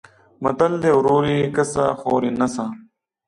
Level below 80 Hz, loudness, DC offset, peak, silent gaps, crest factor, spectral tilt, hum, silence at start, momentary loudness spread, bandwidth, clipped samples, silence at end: -52 dBFS; -19 LUFS; under 0.1%; -4 dBFS; none; 16 dB; -6 dB/octave; none; 0.4 s; 10 LU; 11 kHz; under 0.1%; 0.45 s